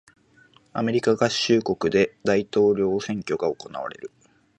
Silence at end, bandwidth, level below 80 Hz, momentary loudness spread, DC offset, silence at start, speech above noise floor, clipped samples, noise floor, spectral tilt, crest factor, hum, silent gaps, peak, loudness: 0.5 s; 11 kHz; -58 dBFS; 14 LU; under 0.1%; 0.75 s; 34 dB; under 0.1%; -57 dBFS; -5 dB/octave; 18 dB; none; none; -6 dBFS; -23 LUFS